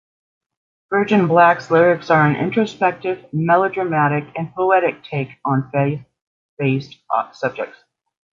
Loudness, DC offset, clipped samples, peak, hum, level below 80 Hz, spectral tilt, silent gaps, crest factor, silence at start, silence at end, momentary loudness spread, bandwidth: -18 LUFS; under 0.1%; under 0.1%; -2 dBFS; none; -62 dBFS; -8 dB/octave; 6.22-6.57 s; 18 dB; 0.9 s; 0.7 s; 11 LU; 7.4 kHz